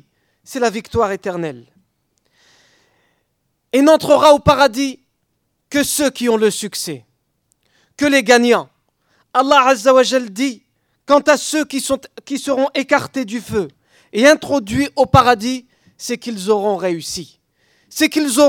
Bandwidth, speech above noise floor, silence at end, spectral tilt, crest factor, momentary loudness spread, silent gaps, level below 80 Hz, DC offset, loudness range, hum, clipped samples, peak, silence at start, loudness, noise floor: 18.5 kHz; 54 dB; 0 s; -4 dB/octave; 16 dB; 14 LU; none; -48 dBFS; under 0.1%; 5 LU; none; under 0.1%; 0 dBFS; 0.5 s; -15 LUFS; -69 dBFS